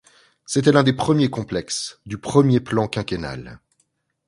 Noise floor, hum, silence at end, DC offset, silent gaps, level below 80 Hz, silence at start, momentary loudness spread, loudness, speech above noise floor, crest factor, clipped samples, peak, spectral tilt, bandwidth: -69 dBFS; none; 0.7 s; under 0.1%; none; -50 dBFS; 0.5 s; 14 LU; -20 LUFS; 49 dB; 20 dB; under 0.1%; 0 dBFS; -5.5 dB/octave; 11.5 kHz